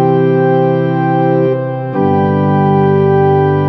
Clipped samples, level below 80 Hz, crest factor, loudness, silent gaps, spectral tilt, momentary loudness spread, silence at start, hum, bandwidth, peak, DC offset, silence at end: under 0.1%; -54 dBFS; 10 dB; -12 LUFS; none; -11.5 dB/octave; 4 LU; 0 s; none; 5.8 kHz; 0 dBFS; under 0.1%; 0 s